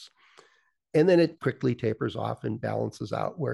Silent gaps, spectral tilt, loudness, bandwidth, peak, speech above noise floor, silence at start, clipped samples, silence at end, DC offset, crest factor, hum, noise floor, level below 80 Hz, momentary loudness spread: none; -7.5 dB/octave; -27 LUFS; 12 kHz; -10 dBFS; 39 dB; 0 s; under 0.1%; 0 s; under 0.1%; 18 dB; none; -66 dBFS; -66 dBFS; 10 LU